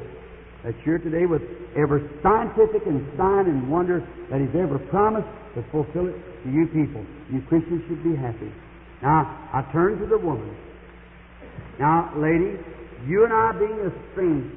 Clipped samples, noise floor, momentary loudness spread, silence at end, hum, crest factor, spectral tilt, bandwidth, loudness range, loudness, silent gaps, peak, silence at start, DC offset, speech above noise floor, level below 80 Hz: under 0.1%; -45 dBFS; 16 LU; 0 s; none; 16 dB; -13 dB/octave; 3.7 kHz; 4 LU; -23 LUFS; none; -6 dBFS; 0 s; under 0.1%; 23 dB; -46 dBFS